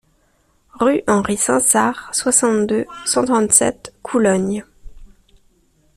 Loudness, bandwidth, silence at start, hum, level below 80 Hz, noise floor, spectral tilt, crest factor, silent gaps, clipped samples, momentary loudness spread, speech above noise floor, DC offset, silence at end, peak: -16 LUFS; 15 kHz; 0.8 s; none; -48 dBFS; -60 dBFS; -3.5 dB/octave; 18 dB; none; under 0.1%; 9 LU; 43 dB; under 0.1%; 0.9 s; 0 dBFS